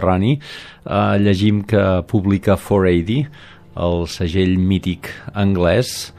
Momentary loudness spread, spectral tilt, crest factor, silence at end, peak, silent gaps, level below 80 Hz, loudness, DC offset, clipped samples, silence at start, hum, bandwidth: 11 LU; -7 dB/octave; 16 dB; 0.1 s; -2 dBFS; none; -40 dBFS; -17 LUFS; under 0.1%; under 0.1%; 0 s; none; 15 kHz